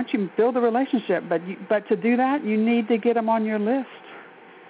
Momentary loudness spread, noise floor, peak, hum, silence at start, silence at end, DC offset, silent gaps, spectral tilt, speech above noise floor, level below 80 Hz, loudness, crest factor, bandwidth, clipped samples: 7 LU; -46 dBFS; -10 dBFS; none; 0 s; 0.4 s; under 0.1%; none; -5 dB/octave; 24 dB; -76 dBFS; -23 LUFS; 14 dB; 4.8 kHz; under 0.1%